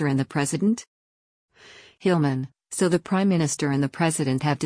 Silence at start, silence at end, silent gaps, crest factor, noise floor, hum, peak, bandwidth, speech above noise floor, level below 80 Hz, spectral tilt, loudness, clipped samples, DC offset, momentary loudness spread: 0 s; 0 s; 0.87-1.48 s; 16 dB; -50 dBFS; none; -8 dBFS; 10.5 kHz; 27 dB; -62 dBFS; -5.5 dB/octave; -24 LUFS; under 0.1%; under 0.1%; 5 LU